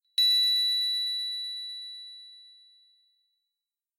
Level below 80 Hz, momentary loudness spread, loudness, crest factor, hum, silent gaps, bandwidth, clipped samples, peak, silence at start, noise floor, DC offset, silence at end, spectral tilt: under -90 dBFS; 21 LU; -24 LUFS; 14 dB; none; none; 15.5 kHz; under 0.1%; -16 dBFS; 0.2 s; -90 dBFS; under 0.1%; 1.55 s; 8 dB/octave